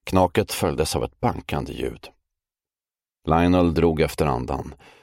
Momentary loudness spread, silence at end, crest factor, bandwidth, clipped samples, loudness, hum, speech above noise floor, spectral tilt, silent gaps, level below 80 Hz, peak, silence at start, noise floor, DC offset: 13 LU; 0.3 s; 20 dB; 16.5 kHz; under 0.1%; -23 LUFS; none; over 68 dB; -6 dB/octave; none; -38 dBFS; -4 dBFS; 0.05 s; under -90 dBFS; under 0.1%